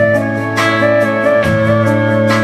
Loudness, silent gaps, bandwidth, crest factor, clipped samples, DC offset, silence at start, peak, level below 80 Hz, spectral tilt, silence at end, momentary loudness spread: -12 LUFS; none; 14.5 kHz; 12 dB; under 0.1%; under 0.1%; 0 s; 0 dBFS; -42 dBFS; -6.5 dB/octave; 0 s; 2 LU